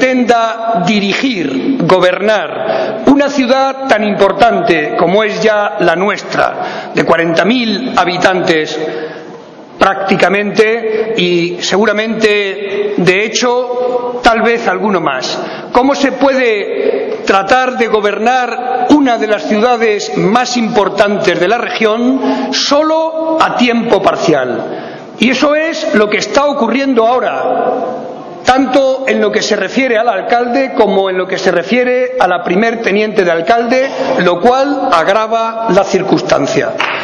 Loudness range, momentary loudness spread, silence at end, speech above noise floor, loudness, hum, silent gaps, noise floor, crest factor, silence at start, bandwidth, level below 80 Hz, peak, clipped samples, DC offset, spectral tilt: 1 LU; 5 LU; 0 s; 20 dB; -11 LUFS; none; none; -31 dBFS; 12 dB; 0 s; 11 kHz; -46 dBFS; 0 dBFS; 0.7%; under 0.1%; -4.5 dB/octave